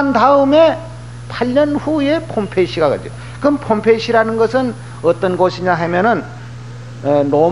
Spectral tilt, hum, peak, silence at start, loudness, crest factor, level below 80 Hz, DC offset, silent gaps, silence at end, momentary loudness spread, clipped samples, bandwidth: -6.5 dB/octave; 60 Hz at -30 dBFS; 0 dBFS; 0 s; -15 LUFS; 14 dB; -44 dBFS; 0.7%; none; 0 s; 19 LU; under 0.1%; 10.5 kHz